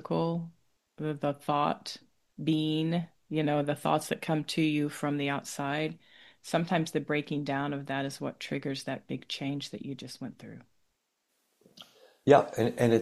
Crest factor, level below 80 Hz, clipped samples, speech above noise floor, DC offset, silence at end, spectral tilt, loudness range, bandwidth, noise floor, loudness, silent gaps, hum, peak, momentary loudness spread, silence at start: 24 dB; -70 dBFS; under 0.1%; 48 dB; under 0.1%; 0 s; -6 dB/octave; 8 LU; 13.5 kHz; -78 dBFS; -31 LUFS; none; none; -6 dBFS; 13 LU; 0 s